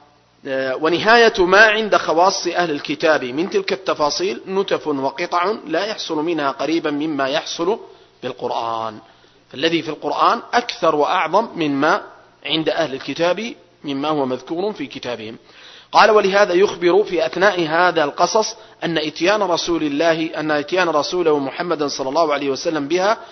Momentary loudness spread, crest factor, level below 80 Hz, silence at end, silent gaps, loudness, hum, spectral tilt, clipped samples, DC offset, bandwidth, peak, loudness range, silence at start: 11 LU; 18 dB; -56 dBFS; 0 s; none; -18 LUFS; none; -3.5 dB/octave; under 0.1%; under 0.1%; 6.4 kHz; 0 dBFS; 7 LU; 0.45 s